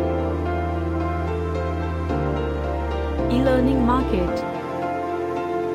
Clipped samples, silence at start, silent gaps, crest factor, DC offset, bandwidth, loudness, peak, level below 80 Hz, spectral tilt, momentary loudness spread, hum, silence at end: under 0.1%; 0 s; none; 16 dB; under 0.1%; 10.5 kHz; -23 LUFS; -8 dBFS; -30 dBFS; -8 dB/octave; 7 LU; none; 0 s